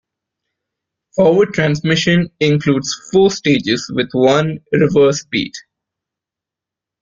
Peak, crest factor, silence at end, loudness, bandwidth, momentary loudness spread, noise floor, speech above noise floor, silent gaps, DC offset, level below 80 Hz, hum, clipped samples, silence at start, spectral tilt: -2 dBFS; 16 dB; 1.45 s; -15 LUFS; 7.6 kHz; 7 LU; -86 dBFS; 72 dB; none; under 0.1%; -52 dBFS; none; under 0.1%; 1.15 s; -5.5 dB/octave